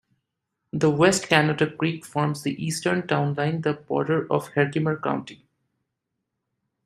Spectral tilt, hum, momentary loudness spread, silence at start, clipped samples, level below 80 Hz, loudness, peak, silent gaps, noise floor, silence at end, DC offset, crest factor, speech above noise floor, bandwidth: -5 dB/octave; none; 8 LU; 0.75 s; under 0.1%; -64 dBFS; -24 LUFS; -2 dBFS; none; -81 dBFS; 1.5 s; under 0.1%; 24 dB; 58 dB; 15 kHz